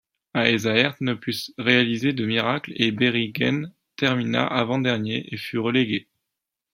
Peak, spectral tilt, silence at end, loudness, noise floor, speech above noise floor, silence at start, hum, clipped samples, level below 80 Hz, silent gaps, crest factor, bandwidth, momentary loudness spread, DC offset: -2 dBFS; -5.5 dB/octave; 0.75 s; -23 LUFS; -84 dBFS; 61 dB; 0.35 s; none; under 0.1%; -64 dBFS; none; 22 dB; 16.5 kHz; 10 LU; under 0.1%